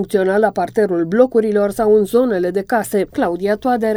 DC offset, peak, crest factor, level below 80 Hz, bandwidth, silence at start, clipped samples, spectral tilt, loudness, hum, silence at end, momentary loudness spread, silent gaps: under 0.1%; 0 dBFS; 16 dB; -48 dBFS; 19 kHz; 0 s; under 0.1%; -6.5 dB/octave; -16 LUFS; none; 0 s; 5 LU; none